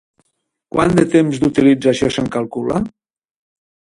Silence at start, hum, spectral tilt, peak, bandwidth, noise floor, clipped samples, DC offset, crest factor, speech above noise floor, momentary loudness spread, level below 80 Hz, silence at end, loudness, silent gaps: 0.75 s; none; -6.5 dB/octave; 0 dBFS; 11.5 kHz; -70 dBFS; under 0.1%; under 0.1%; 16 dB; 55 dB; 9 LU; -44 dBFS; 1.1 s; -16 LUFS; none